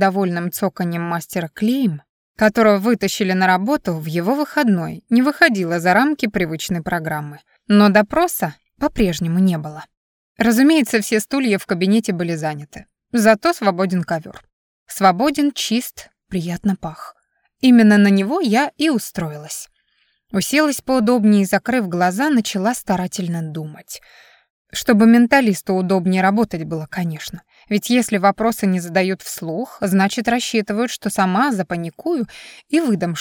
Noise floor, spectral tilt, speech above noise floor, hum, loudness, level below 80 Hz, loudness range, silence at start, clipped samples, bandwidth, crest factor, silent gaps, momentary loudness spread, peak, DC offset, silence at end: -64 dBFS; -5.5 dB/octave; 47 dB; none; -18 LUFS; -48 dBFS; 3 LU; 0 s; under 0.1%; 19 kHz; 16 dB; 2.09-2.35 s, 9.97-10.35 s, 14.53-14.86 s, 24.50-24.65 s; 13 LU; -2 dBFS; under 0.1%; 0 s